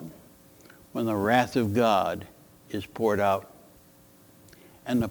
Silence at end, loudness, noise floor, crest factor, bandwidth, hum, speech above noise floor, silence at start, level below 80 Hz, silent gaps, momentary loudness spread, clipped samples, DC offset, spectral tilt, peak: 0 s; -26 LUFS; -56 dBFS; 22 dB; over 20 kHz; none; 31 dB; 0 s; -60 dBFS; none; 15 LU; under 0.1%; under 0.1%; -6 dB/octave; -6 dBFS